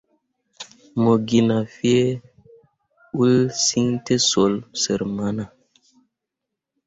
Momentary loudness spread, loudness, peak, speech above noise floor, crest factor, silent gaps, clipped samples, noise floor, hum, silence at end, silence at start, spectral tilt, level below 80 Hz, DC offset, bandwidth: 15 LU; -20 LUFS; -4 dBFS; 64 dB; 18 dB; none; under 0.1%; -83 dBFS; none; 1.4 s; 0.6 s; -4.5 dB/octave; -56 dBFS; under 0.1%; 8 kHz